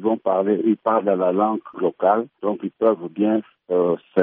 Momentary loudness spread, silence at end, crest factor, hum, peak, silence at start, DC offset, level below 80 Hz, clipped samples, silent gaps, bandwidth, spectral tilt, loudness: 6 LU; 0 s; 16 dB; none; -4 dBFS; 0 s; under 0.1%; -70 dBFS; under 0.1%; none; 3.8 kHz; -7 dB/octave; -21 LUFS